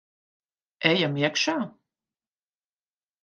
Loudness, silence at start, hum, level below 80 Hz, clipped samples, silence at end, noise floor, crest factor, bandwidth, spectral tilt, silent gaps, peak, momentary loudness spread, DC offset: -24 LUFS; 0.8 s; none; -78 dBFS; under 0.1%; 1.5 s; under -90 dBFS; 24 dB; 10 kHz; -4 dB/octave; none; -6 dBFS; 9 LU; under 0.1%